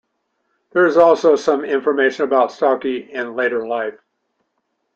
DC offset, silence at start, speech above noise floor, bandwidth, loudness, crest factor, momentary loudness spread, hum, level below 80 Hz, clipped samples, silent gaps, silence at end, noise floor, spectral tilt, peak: under 0.1%; 0.75 s; 55 dB; 7.8 kHz; -17 LUFS; 16 dB; 12 LU; none; -66 dBFS; under 0.1%; none; 1.05 s; -71 dBFS; -5 dB/octave; -2 dBFS